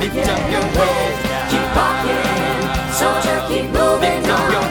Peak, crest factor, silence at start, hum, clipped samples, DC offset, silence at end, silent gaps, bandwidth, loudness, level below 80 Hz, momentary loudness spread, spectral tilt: 0 dBFS; 16 dB; 0 s; none; under 0.1%; under 0.1%; 0 s; none; over 20 kHz; -17 LUFS; -30 dBFS; 3 LU; -4 dB/octave